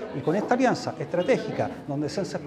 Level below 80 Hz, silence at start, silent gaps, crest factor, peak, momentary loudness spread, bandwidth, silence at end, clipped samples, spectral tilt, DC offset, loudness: -62 dBFS; 0 s; none; 18 dB; -8 dBFS; 7 LU; 12 kHz; 0 s; under 0.1%; -6 dB/octave; under 0.1%; -26 LUFS